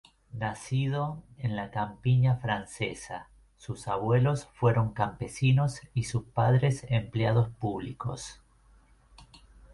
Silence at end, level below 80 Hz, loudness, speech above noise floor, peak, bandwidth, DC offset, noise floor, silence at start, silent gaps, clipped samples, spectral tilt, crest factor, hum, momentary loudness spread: 0.5 s; -54 dBFS; -29 LUFS; 32 dB; -12 dBFS; 11.5 kHz; under 0.1%; -60 dBFS; 0.35 s; none; under 0.1%; -6.5 dB/octave; 18 dB; none; 14 LU